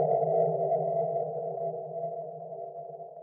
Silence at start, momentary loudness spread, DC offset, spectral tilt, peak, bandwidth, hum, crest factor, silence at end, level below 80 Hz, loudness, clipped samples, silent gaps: 0 s; 14 LU; under 0.1%; -11.5 dB/octave; -16 dBFS; 2.2 kHz; none; 16 dB; 0 s; -84 dBFS; -31 LUFS; under 0.1%; none